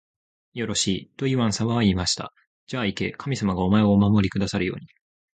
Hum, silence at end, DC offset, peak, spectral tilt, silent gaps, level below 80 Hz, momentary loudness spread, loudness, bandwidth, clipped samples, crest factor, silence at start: none; 0.5 s; under 0.1%; -6 dBFS; -5 dB/octave; 2.47-2.67 s; -44 dBFS; 12 LU; -23 LUFS; 9.4 kHz; under 0.1%; 18 dB; 0.55 s